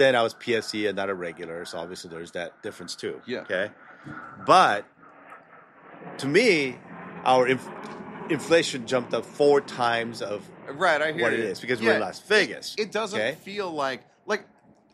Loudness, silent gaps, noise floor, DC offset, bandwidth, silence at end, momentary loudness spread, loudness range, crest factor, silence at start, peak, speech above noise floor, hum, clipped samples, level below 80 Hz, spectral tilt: -25 LUFS; none; -51 dBFS; under 0.1%; 14 kHz; 0.5 s; 17 LU; 7 LU; 22 dB; 0 s; -4 dBFS; 26 dB; none; under 0.1%; -70 dBFS; -4 dB/octave